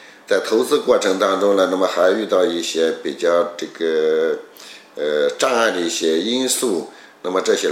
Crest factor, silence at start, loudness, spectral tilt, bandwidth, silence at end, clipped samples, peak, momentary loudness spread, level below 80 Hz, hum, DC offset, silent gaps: 16 dB; 0 s; -18 LUFS; -2.5 dB/octave; 16.5 kHz; 0 s; under 0.1%; -2 dBFS; 9 LU; -68 dBFS; none; under 0.1%; none